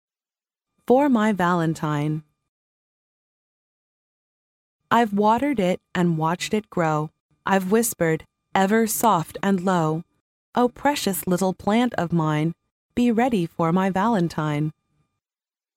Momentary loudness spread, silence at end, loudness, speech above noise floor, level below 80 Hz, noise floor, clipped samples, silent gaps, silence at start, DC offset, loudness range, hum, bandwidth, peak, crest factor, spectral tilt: 8 LU; 1.05 s; -22 LUFS; over 69 dB; -58 dBFS; under -90 dBFS; under 0.1%; 2.49-4.80 s, 7.20-7.29 s, 10.21-10.53 s, 12.71-12.89 s; 0.9 s; under 0.1%; 4 LU; none; 17 kHz; -4 dBFS; 18 dB; -5.5 dB/octave